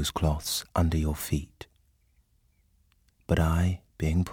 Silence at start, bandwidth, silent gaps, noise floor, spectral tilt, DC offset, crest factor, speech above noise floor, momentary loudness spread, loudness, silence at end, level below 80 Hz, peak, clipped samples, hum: 0 s; 19 kHz; none; -67 dBFS; -5.5 dB/octave; under 0.1%; 18 dB; 40 dB; 21 LU; -28 LUFS; 0 s; -36 dBFS; -10 dBFS; under 0.1%; none